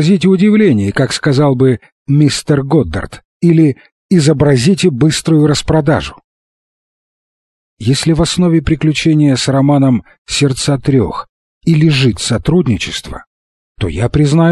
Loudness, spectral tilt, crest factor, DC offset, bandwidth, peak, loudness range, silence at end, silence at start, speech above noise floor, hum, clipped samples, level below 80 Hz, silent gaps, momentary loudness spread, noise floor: -12 LUFS; -6 dB/octave; 12 dB; under 0.1%; 12.5 kHz; 0 dBFS; 4 LU; 0 s; 0 s; over 79 dB; none; under 0.1%; -34 dBFS; 1.92-2.06 s, 3.25-3.40 s, 3.92-4.09 s, 6.24-7.77 s, 10.18-10.25 s, 11.29-11.61 s, 13.27-13.75 s; 10 LU; under -90 dBFS